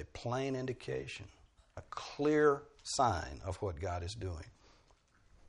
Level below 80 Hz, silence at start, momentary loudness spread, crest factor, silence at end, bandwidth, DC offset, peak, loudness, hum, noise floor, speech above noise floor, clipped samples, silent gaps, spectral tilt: -56 dBFS; 0 s; 19 LU; 20 dB; 0.95 s; 11 kHz; under 0.1%; -18 dBFS; -36 LUFS; none; -68 dBFS; 32 dB; under 0.1%; none; -5 dB/octave